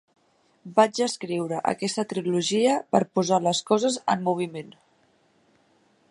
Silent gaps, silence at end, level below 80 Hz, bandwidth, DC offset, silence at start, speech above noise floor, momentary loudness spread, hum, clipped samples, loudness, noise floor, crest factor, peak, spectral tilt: none; 1.4 s; -72 dBFS; 11.5 kHz; under 0.1%; 0.65 s; 40 dB; 7 LU; none; under 0.1%; -24 LUFS; -64 dBFS; 22 dB; -4 dBFS; -4.5 dB/octave